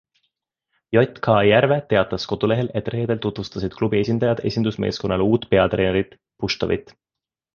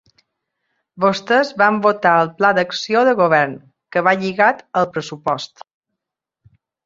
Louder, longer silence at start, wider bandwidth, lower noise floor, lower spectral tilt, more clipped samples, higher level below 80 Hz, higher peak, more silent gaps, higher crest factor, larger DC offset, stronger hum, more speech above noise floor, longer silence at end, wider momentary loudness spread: second, -21 LUFS vs -17 LUFS; about the same, 0.9 s vs 0.95 s; about the same, 7.2 kHz vs 7.8 kHz; first, -88 dBFS vs -83 dBFS; first, -7 dB/octave vs -5 dB/octave; neither; first, -46 dBFS vs -64 dBFS; about the same, -2 dBFS vs -2 dBFS; neither; about the same, 20 dB vs 18 dB; neither; neither; about the same, 68 dB vs 66 dB; second, 0.75 s vs 1.4 s; about the same, 9 LU vs 9 LU